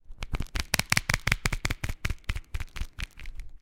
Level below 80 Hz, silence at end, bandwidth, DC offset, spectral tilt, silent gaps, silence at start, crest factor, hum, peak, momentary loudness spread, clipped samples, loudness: -36 dBFS; 0 s; 17 kHz; under 0.1%; -2.5 dB/octave; none; 0.1 s; 28 dB; none; -2 dBFS; 15 LU; under 0.1%; -31 LUFS